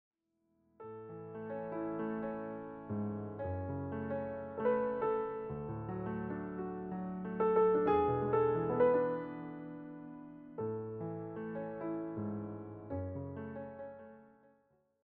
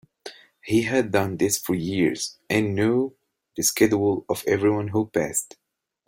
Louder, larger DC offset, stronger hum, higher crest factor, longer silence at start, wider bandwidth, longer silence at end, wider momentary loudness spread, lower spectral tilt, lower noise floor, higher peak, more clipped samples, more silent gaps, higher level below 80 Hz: second, -37 LUFS vs -23 LUFS; neither; neither; about the same, 20 dB vs 18 dB; first, 0.8 s vs 0.25 s; second, 3.8 kHz vs 16.5 kHz; first, 0.8 s vs 0.6 s; about the same, 18 LU vs 16 LU; first, -8 dB/octave vs -4.5 dB/octave; first, -79 dBFS vs -44 dBFS; second, -18 dBFS vs -6 dBFS; neither; neither; second, -64 dBFS vs -58 dBFS